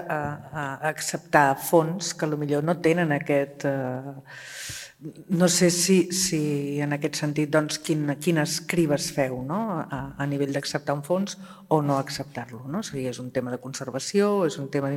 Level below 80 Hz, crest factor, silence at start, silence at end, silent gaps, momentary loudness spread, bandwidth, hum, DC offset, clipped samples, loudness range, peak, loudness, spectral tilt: -60 dBFS; 24 dB; 0 s; 0 s; none; 13 LU; 16.5 kHz; none; under 0.1%; under 0.1%; 5 LU; -2 dBFS; -25 LUFS; -4.5 dB/octave